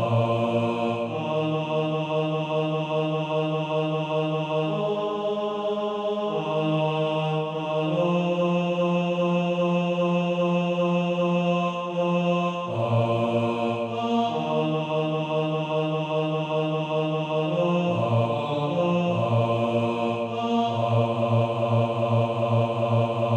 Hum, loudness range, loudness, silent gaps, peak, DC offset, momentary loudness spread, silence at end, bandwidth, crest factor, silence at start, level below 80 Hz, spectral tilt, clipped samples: none; 2 LU; -25 LUFS; none; -10 dBFS; under 0.1%; 3 LU; 0 s; 8.4 kHz; 14 dB; 0 s; -68 dBFS; -8 dB/octave; under 0.1%